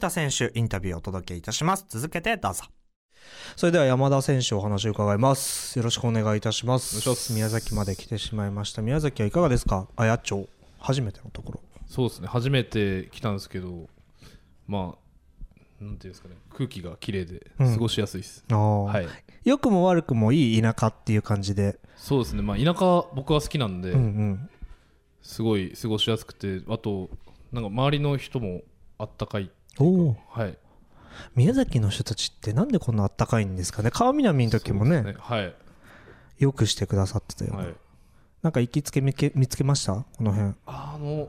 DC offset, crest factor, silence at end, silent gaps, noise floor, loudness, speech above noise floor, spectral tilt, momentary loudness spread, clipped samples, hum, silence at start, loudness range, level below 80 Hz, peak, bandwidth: under 0.1%; 16 dB; 0 s; 2.96-3.09 s; -59 dBFS; -25 LUFS; 34 dB; -5.5 dB/octave; 14 LU; under 0.1%; none; 0 s; 6 LU; -44 dBFS; -8 dBFS; 16 kHz